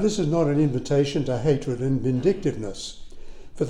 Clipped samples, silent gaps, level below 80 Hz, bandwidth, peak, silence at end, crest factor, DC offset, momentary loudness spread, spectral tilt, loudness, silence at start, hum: under 0.1%; none; -42 dBFS; 10.5 kHz; -8 dBFS; 0 s; 16 dB; under 0.1%; 11 LU; -7 dB/octave; -24 LUFS; 0 s; none